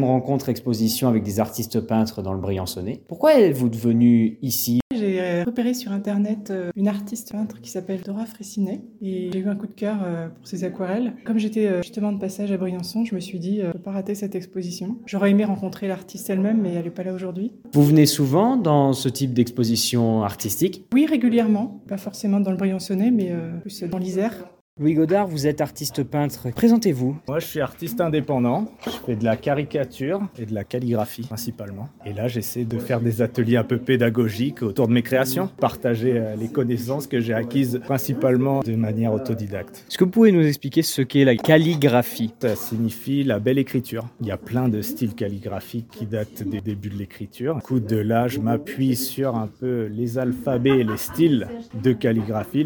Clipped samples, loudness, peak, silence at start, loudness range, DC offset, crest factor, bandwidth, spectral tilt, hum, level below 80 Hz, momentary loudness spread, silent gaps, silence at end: under 0.1%; -22 LUFS; 0 dBFS; 0 s; 7 LU; under 0.1%; 22 dB; 19 kHz; -6 dB/octave; none; -58 dBFS; 12 LU; 4.82-4.90 s, 24.61-24.77 s; 0 s